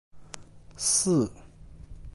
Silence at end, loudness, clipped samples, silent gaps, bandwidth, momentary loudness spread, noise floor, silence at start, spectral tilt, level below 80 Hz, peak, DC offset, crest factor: 0.05 s; -25 LUFS; under 0.1%; none; 12 kHz; 24 LU; -47 dBFS; 0.15 s; -4 dB/octave; -50 dBFS; -10 dBFS; under 0.1%; 20 dB